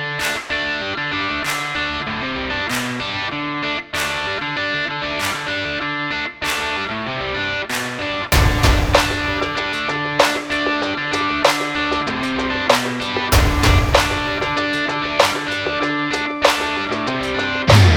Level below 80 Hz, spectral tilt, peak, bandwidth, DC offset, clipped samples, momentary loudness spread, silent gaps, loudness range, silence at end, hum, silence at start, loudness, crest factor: -28 dBFS; -4 dB/octave; 0 dBFS; over 20 kHz; under 0.1%; under 0.1%; 7 LU; none; 4 LU; 0 s; none; 0 s; -19 LUFS; 18 dB